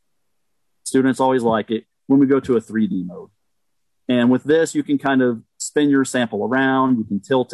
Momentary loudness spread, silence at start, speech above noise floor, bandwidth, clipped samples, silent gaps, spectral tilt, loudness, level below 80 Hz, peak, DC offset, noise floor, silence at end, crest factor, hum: 10 LU; 0.85 s; 60 dB; 12 kHz; under 0.1%; none; -5.5 dB/octave; -19 LUFS; -60 dBFS; -6 dBFS; under 0.1%; -78 dBFS; 0 s; 14 dB; none